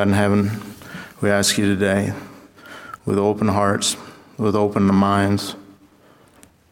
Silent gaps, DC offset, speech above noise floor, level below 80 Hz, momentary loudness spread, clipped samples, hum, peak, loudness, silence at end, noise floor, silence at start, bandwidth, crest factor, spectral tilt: none; under 0.1%; 34 dB; -56 dBFS; 19 LU; under 0.1%; none; -2 dBFS; -19 LUFS; 1.1 s; -52 dBFS; 0 s; 17 kHz; 18 dB; -5 dB/octave